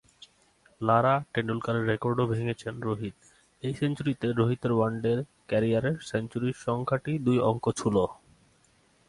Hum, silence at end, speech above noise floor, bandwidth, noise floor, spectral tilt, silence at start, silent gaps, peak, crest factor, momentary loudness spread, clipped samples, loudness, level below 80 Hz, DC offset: none; 0.95 s; 37 dB; 11.5 kHz; -64 dBFS; -7 dB/octave; 0.8 s; none; -8 dBFS; 20 dB; 8 LU; under 0.1%; -28 LUFS; -58 dBFS; under 0.1%